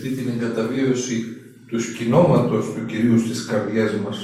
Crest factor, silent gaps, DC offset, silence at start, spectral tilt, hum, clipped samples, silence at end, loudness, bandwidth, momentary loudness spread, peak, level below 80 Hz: 18 dB; none; under 0.1%; 0 s; -6 dB/octave; none; under 0.1%; 0 s; -21 LUFS; 13.5 kHz; 10 LU; -2 dBFS; -54 dBFS